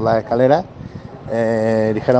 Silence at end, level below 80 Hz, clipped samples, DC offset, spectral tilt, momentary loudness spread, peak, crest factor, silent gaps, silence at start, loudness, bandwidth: 0 s; -48 dBFS; under 0.1%; under 0.1%; -8 dB/octave; 19 LU; 0 dBFS; 16 dB; none; 0 s; -17 LUFS; 9 kHz